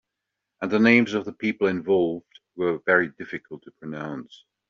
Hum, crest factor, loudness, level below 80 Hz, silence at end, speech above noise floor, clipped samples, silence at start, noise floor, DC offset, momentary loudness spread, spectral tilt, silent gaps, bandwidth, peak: none; 22 dB; -23 LUFS; -68 dBFS; 0.35 s; 60 dB; under 0.1%; 0.6 s; -83 dBFS; under 0.1%; 19 LU; -4.5 dB/octave; none; 7.2 kHz; -4 dBFS